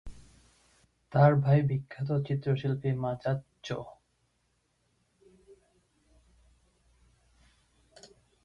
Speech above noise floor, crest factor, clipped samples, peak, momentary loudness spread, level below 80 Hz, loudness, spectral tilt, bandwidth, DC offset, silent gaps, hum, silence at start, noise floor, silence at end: 47 dB; 22 dB; under 0.1%; -10 dBFS; 15 LU; -60 dBFS; -29 LUFS; -8.5 dB/octave; 7.2 kHz; under 0.1%; none; none; 0.05 s; -74 dBFS; 4.55 s